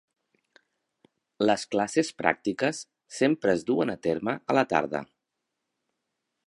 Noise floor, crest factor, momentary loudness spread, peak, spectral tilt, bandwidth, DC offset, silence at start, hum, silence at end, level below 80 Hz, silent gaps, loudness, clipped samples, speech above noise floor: -83 dBFS; 26 dB; 6 LU; -4 dBFS; -5 dB/octave; 11.5 kHz; under 0.1%; 1.4 s; none; 1.4 s; -66 dBFS; none; -27 LUFS; under 0.1%; 57 dB